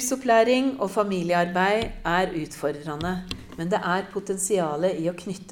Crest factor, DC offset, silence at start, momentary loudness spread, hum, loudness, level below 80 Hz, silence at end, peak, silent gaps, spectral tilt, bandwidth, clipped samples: 18 dB; under 0.1%; 0 s; 10 LU; none; -25 LUFS; -48 dBFS; 0 s; -6 dBFS; none; -4.5 dB/octave; 18 kHz; under 0.1%